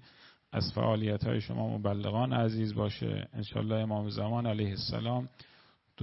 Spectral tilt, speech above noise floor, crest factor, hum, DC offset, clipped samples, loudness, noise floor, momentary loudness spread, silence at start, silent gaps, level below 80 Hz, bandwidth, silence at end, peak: -6 dB/octave; 28 dB; 18 dB; none; under 0.1%; under 0.1%; -33 LUFS; -60 dBFS; 6 LU; 0.2 s; none; -60 dBFS; 5.8 kHz; 0 s; -16 dBFS